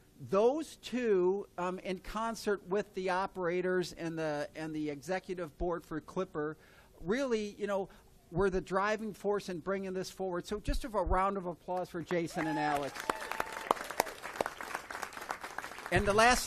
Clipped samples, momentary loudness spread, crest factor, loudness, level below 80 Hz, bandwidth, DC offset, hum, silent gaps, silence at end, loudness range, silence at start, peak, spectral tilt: under 0.1%; 10 LU; 28 dB; -35 LUFS; -50 dBFS; 14 kHz; under 0.1%; none; none; 0 s; 4 LU; 0.2 s; -8 dBFS; -4.5 dB/octave